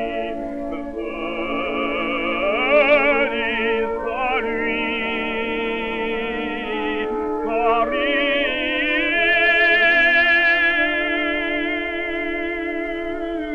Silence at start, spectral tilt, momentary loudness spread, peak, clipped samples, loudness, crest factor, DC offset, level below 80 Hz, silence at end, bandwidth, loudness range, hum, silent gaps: 0 s; -5 dB/octave; 12 LU; -4 dBFS; under 0.1%; -19 LUFS; 16 dB; under 0.1%; -44 dBFS; 0 s; 8 kHz; 7 LU; none; none